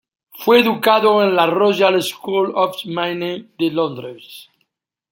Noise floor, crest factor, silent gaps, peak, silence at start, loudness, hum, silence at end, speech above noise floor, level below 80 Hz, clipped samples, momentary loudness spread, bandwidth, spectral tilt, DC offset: -70 dBFS; 16 dB; none; -2 dBFS; 0.35 s; -16 LUFS; none; 0.7 s; 54 dB; -68 dBFS; under 0.1%; 11 LU; 17 kHz; -5 dB/octave; under 0.1%